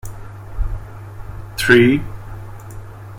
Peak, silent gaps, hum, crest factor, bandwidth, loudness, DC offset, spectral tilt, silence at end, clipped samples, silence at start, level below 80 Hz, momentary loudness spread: 0 dBFS; none; none; 18 dB; 16.5 kHz; -16 LUFS; under 0.1%; -5.5 dB/octave; 0 s; under 0.1%; 0.05 s; -30 dBFS; 24 LU